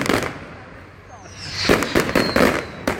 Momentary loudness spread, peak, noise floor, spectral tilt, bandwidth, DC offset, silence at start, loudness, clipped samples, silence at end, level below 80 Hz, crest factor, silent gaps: 22 LU; 0 dBFS; -41 dBFS; -4 dB/octave; 17 kHz; under 0.1%; 0 s; -19 LUFS; under 0.1%; 0 s; -40 dBFS; 22 dB; none